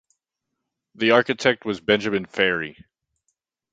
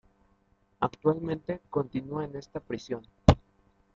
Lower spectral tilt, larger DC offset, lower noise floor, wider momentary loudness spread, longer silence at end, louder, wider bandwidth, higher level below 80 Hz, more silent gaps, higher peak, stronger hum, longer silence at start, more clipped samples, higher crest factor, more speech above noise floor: second, -4.5 dB/octave vs -7.5 dB/octave; neither; first, -82 dBFS vs -68 dBFS; second, 8 LU vs 13 LU; first, 1 s vs 0.55 s; first, -21 LUFS vs -30 LUFS; first, 9 kHz vs 7.8 kHz; second, -60 dBFS vs -42 dBFS; neither; about the same, 0 dBFS vs -2 dBFS; neither; first, 1 s vs 0.8 s; neither; about the same, 24 dB vs 28 dB; first, 60 dB vs 35 dB